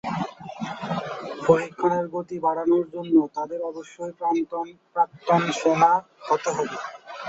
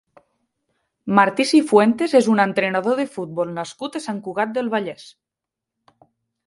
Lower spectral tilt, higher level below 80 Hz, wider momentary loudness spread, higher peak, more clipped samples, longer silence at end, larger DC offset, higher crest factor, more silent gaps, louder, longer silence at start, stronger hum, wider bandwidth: about the same, -6 dB/octave vs -5 dB/octave; about the same, -64 dBFS vs -68 dBFS; about the same, 13 LU vs 13 LU; about the same, -2 dBFS vs 0 dBFS; neither; second, 0 s vs 1.4 s; neither; about the same, 22 dB vs 20 dB; neither; second, -24 LUFS vs -19 LUFS; second, 0.05 s vs 1.05 s; neither; second, 8 kHz vs 11.5 kHz